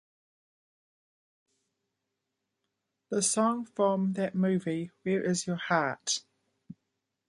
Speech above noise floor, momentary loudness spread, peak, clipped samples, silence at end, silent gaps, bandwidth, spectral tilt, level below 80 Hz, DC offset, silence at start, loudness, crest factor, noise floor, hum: 55 dB; 6 LU; -10 dBFS; under 0.1%; 0.55 s; none; 11.5 kHz; -4.5 dB/octave; -76 dBFS; under 0.1%; 3.1 s; -30 LUFS; 22 dB; -85 dBFS; none